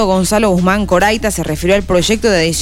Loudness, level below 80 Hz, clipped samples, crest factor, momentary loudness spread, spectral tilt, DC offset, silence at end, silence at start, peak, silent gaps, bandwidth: -13 LUFS; -28 dBFS; under 0.1%; 10 dB; 4 LU; -4.5 dB/octave; 2%; 0 s; 0 s; -2 dBFS; none; 16.5 kHz